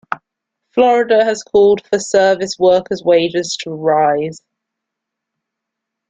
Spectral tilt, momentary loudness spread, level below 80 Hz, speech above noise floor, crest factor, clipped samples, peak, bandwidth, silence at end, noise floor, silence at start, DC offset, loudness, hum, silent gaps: -4 dB/octave; 10 LU; -58 dBFS; 66 dB; 14 dB; under 0.1%; -2 dBFS; 9.4 kHz; 1.7 s; -80 dBFS; 0.1 s; under 0.1%; -14 LUFS; none; none